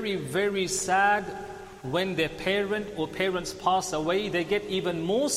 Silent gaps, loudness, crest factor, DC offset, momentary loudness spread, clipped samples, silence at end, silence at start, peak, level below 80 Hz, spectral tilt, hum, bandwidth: none; -27 LUFS; 16 dB; under 0.1%; 8 LU; under 0.1%; 0 s; 0 s; -12 dBFS; -54 dBFS; -3.5 dB/octave; none; 15 kHz